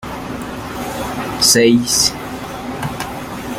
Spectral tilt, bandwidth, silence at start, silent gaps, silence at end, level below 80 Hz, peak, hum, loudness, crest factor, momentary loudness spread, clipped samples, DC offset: -2.5 dB/octave; 16.5 kHz; 0 s; none; 0 s; -40 dBFS; 0 dBFS; none; -16 LUFS; 18 dB; 16 LU; under 0.1%; under 0.1%